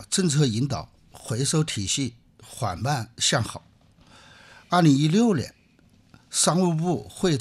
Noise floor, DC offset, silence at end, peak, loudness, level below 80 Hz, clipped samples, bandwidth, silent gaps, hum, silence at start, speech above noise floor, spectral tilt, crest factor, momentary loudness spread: -58 dBFS; under 0.1%; 0 s; -8 dBFS; -24 LUFS; -56 dBFS; under 0.1%; 14 kHz; none; none; 0 s; 35 dB; -4.5 dB/octave; 18 dB; 14 LU